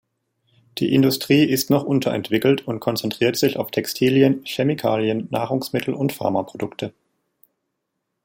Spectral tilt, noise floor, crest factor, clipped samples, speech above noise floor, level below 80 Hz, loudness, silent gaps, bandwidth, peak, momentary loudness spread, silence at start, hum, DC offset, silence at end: -5.5 dB/octave; -77 dBFS; 18 dB; under 0.1%; 57 dB; -62 dBFS; -20 LUFS; none; 17 kHz; -2 dBFS; 9 LU; 0.75 s; none; under 0.1%; 1.35 s